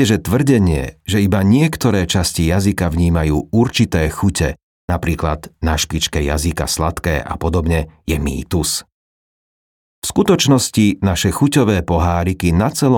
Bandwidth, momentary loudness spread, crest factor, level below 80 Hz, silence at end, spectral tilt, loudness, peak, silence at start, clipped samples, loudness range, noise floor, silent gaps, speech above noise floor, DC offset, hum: 19 kHz; 7 LU; 14 dB; -30 dBFS; 0 s; -5.5 dB/octave; -16 LUFS; -2 dBFS; 0 s; under 0.1%; 4 LU; under -90 dBFS; 4.63-4.88 s, 8.92-10.02 s; over 75 dB; under 0.1%; none